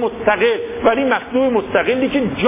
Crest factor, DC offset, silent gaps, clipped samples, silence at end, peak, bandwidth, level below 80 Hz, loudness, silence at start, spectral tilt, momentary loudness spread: 14 dB; under 0.1%; none; under 0.1%; 0 s; -2 dBFS; 3.8 kHz; -44 dBFS; -17 LUFS; 0 s; -9.5 dB/octave; 2 LU